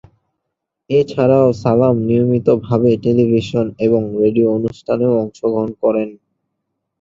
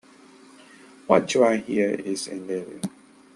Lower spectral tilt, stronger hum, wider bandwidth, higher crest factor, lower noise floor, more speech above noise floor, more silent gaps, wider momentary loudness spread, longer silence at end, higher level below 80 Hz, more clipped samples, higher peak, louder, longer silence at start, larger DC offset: first, -9 dB/octave vs -4.5 dB/octave; neither; second, 7.6 kHz vs 12.5 kHz; second, 14 dB vs 24 dB; first, -77 dBFS vs -51 dBFS; first, 63 dB vs 28 dB; neither; second, 6 LU vs 14 LU; first, 0.85 s vs 0.45 s; first, -50 dBFS vs -68 dBFS; neither; about the same, -2 dBFS vs -2 dBFS; first, -15 LUFS vs -24 LUFS; second, 0.9 s vs 1.1 s; neither